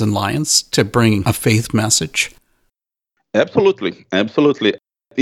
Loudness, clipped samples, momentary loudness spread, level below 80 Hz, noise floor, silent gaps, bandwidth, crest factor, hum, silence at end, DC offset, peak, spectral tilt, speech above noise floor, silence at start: -16 LUFS; under 0.1%; 7 LU; -48 dBFS; -77 dBFS; none; 16.5 kHz; 16 dB; none; 0 s; under 0.1%; 0 dBFS; -4 dB/octave; 61 dB; 0 s